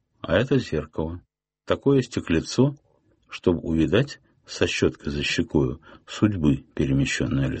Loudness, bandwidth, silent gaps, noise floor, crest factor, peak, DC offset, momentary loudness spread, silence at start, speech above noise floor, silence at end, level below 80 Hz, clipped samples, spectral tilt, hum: -24 LUFS; 8.4 kHz; none; -60 dBFS; 20 dB; -4 dBFS; under 0.1%; 11 LU; 0.25 s; 37 dB; 0 s; -42 dBFS; under 0.1%; -6 dB/octave; none